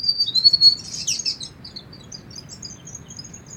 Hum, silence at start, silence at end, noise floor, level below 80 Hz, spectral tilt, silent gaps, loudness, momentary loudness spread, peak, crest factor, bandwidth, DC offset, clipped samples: none; 0 s; 0 s; -40 dBFS; -56 dBFS; 0 dB/octave; none; -15 LUFS; 25 LU; -2 dBFS; 20 dB; 16.5 kHz; under 0.1%; under 0.1%